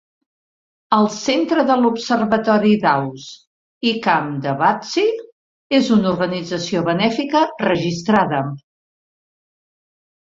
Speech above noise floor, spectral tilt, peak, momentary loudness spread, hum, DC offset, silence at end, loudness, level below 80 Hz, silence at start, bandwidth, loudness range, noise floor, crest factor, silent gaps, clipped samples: over 73 dB; -5.5 dB/octave; -2 dBFS; 8 LU; none; under 0.1%; 1.7 s; -18 LUFS; -58 dBFS; 0.9 s; 7.6 kHz; 2 LU; under -90 dBFS; 18 dB; 3.47-3.81 s, 5.32-5.70 s; under 0.1%